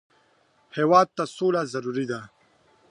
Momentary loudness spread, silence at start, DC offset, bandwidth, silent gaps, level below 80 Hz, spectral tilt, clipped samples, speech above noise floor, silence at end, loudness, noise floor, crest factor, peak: 14 LU; 0.75 s; under 0.1%; 11 kHz; none; -70 dBFS; -6 dB/octave; under 0.1%; 40 dB; 0.65 s; -24 LUFS; -63 dBFS; 22 dB; -4 dBFS